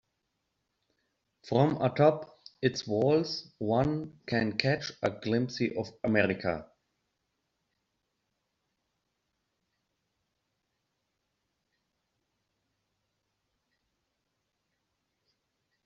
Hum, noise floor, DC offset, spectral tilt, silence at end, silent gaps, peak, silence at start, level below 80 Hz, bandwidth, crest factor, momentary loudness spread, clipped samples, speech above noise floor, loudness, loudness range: none; -82 dBFS; under 0.1%; -5 dB/octave; 9.2 s; none; -6 dBFS; 1.45 s; -64 dBFS; 7.6 kHz; 28 dB; 9 LU; under 0.1%; 53 dB; -30 LUFS; 6 LU